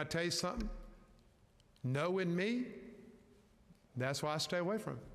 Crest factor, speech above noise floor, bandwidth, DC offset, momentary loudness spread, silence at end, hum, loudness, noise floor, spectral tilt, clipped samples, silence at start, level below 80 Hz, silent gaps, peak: 16 dB; 30 dB; 15 kHz; under 0.1%; 17 LU; 0 s; none; -38 LUFS; -68 dBFS; -4.5 dB/octave; under 0.1%; 0 s; -56 dBFS; none; -24 dBFS